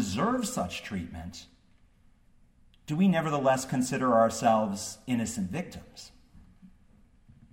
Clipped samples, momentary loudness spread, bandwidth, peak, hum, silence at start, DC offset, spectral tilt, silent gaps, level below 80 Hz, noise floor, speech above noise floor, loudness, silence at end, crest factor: under 0.1%; 20 LU; 16 kHz; -10 dBFS; none; 0 s; under 0.1%; -5.5 dB/octave; none; -58 dBFS; -61 dBFS; 33 dB; -28 LUFS; 0.85 s; 20 dB